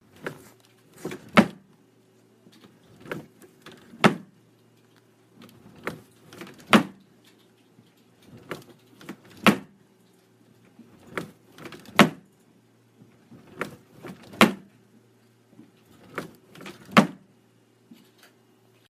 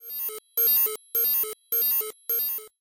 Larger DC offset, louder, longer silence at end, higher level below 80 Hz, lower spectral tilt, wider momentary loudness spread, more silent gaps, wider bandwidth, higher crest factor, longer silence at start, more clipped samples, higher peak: neither; about the same, -24 LUFS vs -23 LUFS; first, 1.8 s vs 0.15 s; about the same, -68 dBFS vs -72 dBFS; first, -5 dB/octave vs 1 dB/octave; first, 24 LU vs 9 LU; neither; about the same, 15.5 kHz vs 17 kHz; first, 30 dB vs 12 dB; first, 0.25 s vs 0 s; neither; first, 0 dBFS vs -14 dBFS